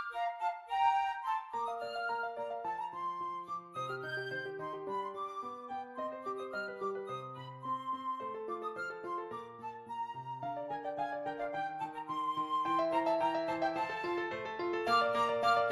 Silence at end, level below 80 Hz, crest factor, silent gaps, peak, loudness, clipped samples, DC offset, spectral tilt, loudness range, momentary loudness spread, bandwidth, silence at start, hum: 0 s; -76 dBFS; 20 dB; none; -18 dBFS; -37 LUFS; under 0.1%; under 0.1%; -5 dB/octave; 7 LU; 11 LU; 14.5 kHz; 0 s; none